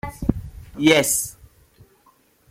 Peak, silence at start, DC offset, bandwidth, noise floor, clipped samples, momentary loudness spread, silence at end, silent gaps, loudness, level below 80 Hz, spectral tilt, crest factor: -2 dBFS; 0.05 s; under 0.1%; 16.5 kHz; -58 dBFS; under 0.1%; 18 LU; 1.2 s; none; -20 LUFS; -40 dBFS; -3.5 dB/octave; 22 dB